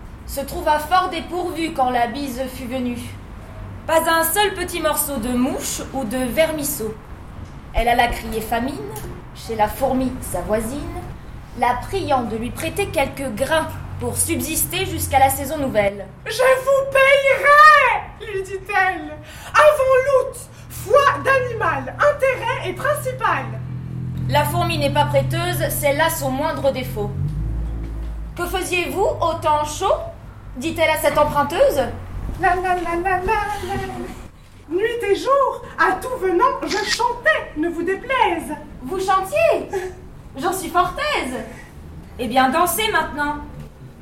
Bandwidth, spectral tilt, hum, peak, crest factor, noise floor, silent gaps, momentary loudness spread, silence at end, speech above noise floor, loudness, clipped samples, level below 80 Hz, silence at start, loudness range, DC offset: 16.5 kHz; -4 dB/octave; none; -2 dBFS; 18 dB; -39 dBFS; none; 15 LU; 0 s; 20 dB; -19 LUFS; under 0.1%; -36 dBFS; 0 s; 8 LU; under 0.1%